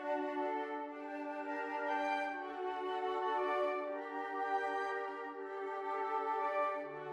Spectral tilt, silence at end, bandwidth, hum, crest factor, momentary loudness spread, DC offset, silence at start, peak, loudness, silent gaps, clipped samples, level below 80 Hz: -4.5 dB/octave; 0 s; 11.5 kHz; none; 14 dB; 7 LU; under 0.1%; 0 s; -24 dBFS; -39 LUFS; none; under 0.1%; -82 dBFS